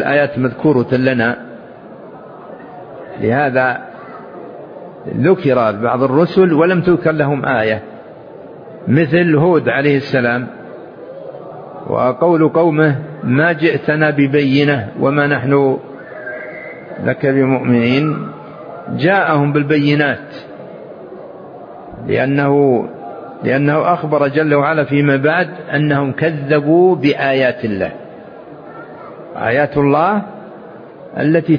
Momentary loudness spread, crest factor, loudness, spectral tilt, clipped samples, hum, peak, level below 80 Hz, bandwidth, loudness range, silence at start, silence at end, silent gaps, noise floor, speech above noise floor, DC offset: 21 LU; 14 dB; -14 LUFS; -9.5 dB/octave; under 0.1%; none; 0 dBFS; -52 dBFS; 5.2 kHz; 5 LU; 0 s; 0 s; none; -35 dBFS; 21 dB; under 0.1%